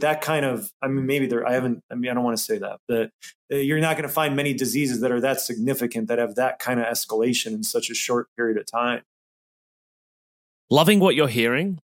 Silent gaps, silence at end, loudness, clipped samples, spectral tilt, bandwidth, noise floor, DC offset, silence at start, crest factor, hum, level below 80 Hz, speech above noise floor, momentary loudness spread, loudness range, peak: 0.73-0.80 s, 1.83-1.89 s, 2.79-2.87 s, 3.14-3.19 s, 3.35-3.49 s, 8.28-8.36 s, 9.06-10.68 s; 0.1 s; -23 LUFS; under 0.1%; -4.5 dB/octave; 17 kHz; under -90 dBFS; under 0.1%; 0 s; 20 dB; none; -70 dBFS; over 67 dB; 8 LU; 3 LU; -4 dBFS